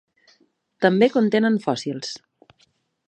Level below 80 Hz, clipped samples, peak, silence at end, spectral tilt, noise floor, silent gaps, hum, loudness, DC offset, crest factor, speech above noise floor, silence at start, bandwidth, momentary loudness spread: -74 dBFS; under 0.1%; -2 dBFS; 0.9 s; -6 dB/octave; -64 dBFS; none; none; -20 LUFS; under 0.1%; 20 dB; 45 dB; 0.8 s; 9 kHz; 14 LU